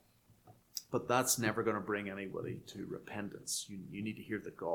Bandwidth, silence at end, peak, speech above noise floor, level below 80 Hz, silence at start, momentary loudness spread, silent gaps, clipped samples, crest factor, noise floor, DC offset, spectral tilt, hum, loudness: 19 kHz; 0 s; -16 dBFS; 27 dB; -72 dBFS; 0.3 s; 14 LU; none; under 0.1%; 22 dB; -65 dBFS; under 0.1%; -3.5 dB/octave; none; -38 LUFS